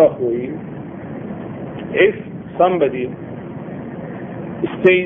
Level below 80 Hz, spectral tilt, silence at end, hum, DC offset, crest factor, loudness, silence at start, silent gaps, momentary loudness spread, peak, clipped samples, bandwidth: -52 dBFS; -9 dB/octave; 0 s; none; under 0.1%; 20 dB; -21 LUFS; 0 s; none; 15 LU; 0 dBFS; under 0.1%; 3.7 kHz